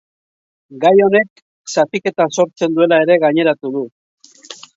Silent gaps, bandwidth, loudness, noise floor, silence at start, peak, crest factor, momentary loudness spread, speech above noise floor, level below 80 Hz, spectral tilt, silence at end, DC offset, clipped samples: 1.30-1.36 s, 1.42-1.64 s, 3.92-4.18 s; 7.8 kHz; -14 LUFS; -38 dBFS; 0.7 s; 0 dBFS; 16 dB; 16 LU; 24 dB; -66 dBFS; -5 dB/octave; 0.2 s; under 0.1%; under 0.1%